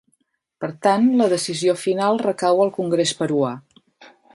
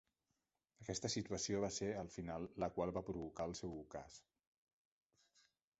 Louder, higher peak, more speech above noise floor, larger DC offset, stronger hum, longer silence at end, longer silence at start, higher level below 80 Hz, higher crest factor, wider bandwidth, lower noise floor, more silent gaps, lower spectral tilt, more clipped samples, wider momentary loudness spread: first, -19 LUFS vs -45 LUFS; first, -4 dBFS vs -26 dBFS; first, 50 dB vs 45 dB; neither; neither; second, 0.3 s vs 1.6 s; second, 0.6 s vs 0.8 s; about the same, -68 dBFS vs -66 dBFS; about the same, 18 dB vs 20 dB; first, 11.5 kHz vs 8 kHz; second, -69 dBFS vs -90 dBFS; neither; about the same, -5 dB/octave vs -5 dB/octave; neither; second, 8 LU vs 13 LU